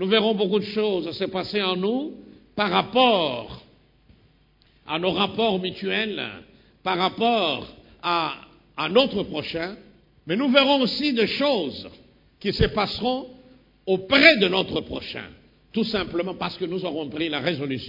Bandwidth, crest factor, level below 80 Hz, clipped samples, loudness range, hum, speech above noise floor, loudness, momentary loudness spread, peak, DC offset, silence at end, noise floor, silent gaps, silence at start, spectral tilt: 5.4 kHz; 24 dB; -48 dBFS; under 0.1%; 5 LU; none; 36 dB; -23 LUFS; 15 LU; 0 dBFS; under 0.1%; 0 s; -59 dBFS; none; 0 s; -6.5 dB/octave